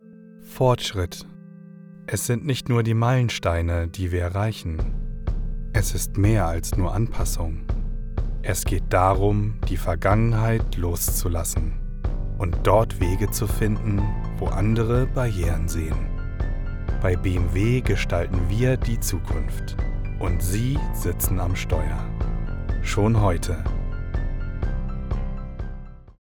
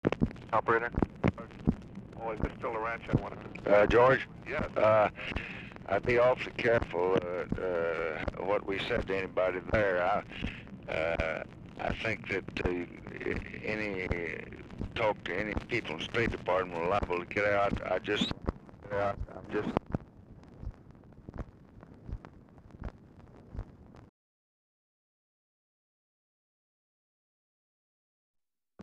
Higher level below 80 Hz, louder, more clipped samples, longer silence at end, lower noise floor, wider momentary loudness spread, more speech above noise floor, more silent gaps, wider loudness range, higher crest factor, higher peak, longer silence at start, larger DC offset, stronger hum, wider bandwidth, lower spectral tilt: first, -28 dBFS vs -48 dBFS; first, -25 LUFS vs -32 LUFS; neither; first, 0.3 s vs 0 s; second, -45 dBFS vs -54 dBFS; second, 11 LU vs 20 LU; about the same, 23 dB vs 23 dB; second, none vs 24.09-28.34 s; second, 3 LU vs 20 LU; second, 18 dB vs 24 dB; first, -4 dBFS vs -10 dBFS; about the same, 0.1 s vs 0.05 s; neither; neither; first, 20 kHz vs 10 kHz; about the same, -6 dB/octave vs -6.5 dB/octave